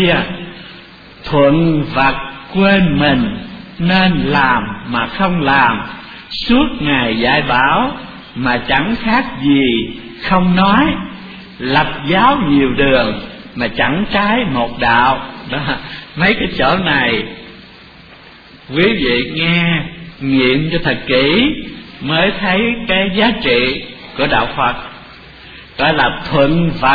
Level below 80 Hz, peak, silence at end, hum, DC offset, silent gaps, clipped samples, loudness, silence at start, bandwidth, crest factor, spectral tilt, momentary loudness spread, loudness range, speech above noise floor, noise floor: -34 dBFS; 0 dBFS; 0 s; none; under 0.1%; none; under 0.1%; -14 LUFS; 0 s; 5 kHz; 14 dB; -8 dB/octave; 15 LU; 3 LU; 26 dB; -39 dBFS